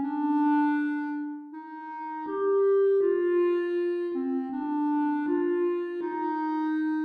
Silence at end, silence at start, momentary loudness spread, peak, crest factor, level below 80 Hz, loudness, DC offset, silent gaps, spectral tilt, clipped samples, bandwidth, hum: 0 s; 0 s; 12 LU; -16 dBFS; 10 dB; -80 dBFS; -27 LUFS; under 0.1%; none; -7 dB/octave; under 0.1%; 4.9 kHz; none